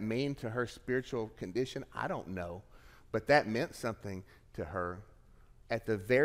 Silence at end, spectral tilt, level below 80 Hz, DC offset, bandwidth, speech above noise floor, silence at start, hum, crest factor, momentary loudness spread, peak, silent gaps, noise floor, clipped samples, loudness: 0 s; -6 dB/octave; -60 dBFS; under 0.1%; 16 kHz; 25 dB; 0 s; none; 22 dB; 16 LU; -14 dBFS; none; -59 dBFS; under 0.1%; -36 LUFS